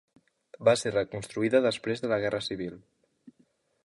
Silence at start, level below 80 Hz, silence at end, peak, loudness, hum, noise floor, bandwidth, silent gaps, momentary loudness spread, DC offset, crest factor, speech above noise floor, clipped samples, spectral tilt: 0.6 s; -64 dBFS; 0.55 s; -8 dBFS; -28 LUFS; none; -68 dBFS; 11.5 kHz; none; 10 LU; under 0.1%; 20 dB; 41 dB; under 0.1%; -5 dB/octave